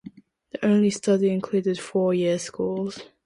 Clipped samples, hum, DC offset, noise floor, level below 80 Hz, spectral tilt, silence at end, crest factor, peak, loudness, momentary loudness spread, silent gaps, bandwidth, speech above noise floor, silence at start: under 0.1%; none; under 0.1%; -46 dBFS; -66 dBFS; -6 dB/octave; 0.2 s; 14 dB; -10 dBFS; -24 LUFS; 8 LU; none; 11 kHz; 23 dB; 0.05 s